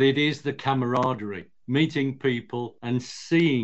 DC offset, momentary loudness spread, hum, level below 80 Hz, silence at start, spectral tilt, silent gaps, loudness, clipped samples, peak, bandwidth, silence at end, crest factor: 0.2%; 10 LU; none; -66 dBFS; 0 s; -6.5 dB/octave; none; -26 LUFS; under 0.1%; -10 dBFS; 8.4 kHz; 0 s; 16 dB